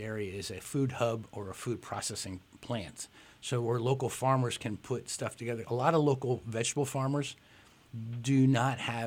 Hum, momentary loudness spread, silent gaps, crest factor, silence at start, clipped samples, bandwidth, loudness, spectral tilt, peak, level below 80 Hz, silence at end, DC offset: none; 15 LU; none; 20 dB; 0 s; under 0.1%; 16 kHz; -33 LUFS; -5.5 dB/octave; -12 dBFS; -66 dBFS; 0 s; under 0.1%